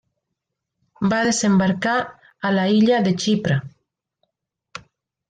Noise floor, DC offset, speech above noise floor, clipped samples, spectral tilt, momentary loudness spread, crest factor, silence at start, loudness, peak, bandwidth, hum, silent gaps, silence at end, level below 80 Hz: -80 dBFS; under 0.1%; 62 dB; under 0.1%; -5 dB/octave; 22 LU; 14 dB; 1 s; -19 LUFS; -8 dBFS; 9.4 kHz; none; none; 0.5 s; -60 dBFS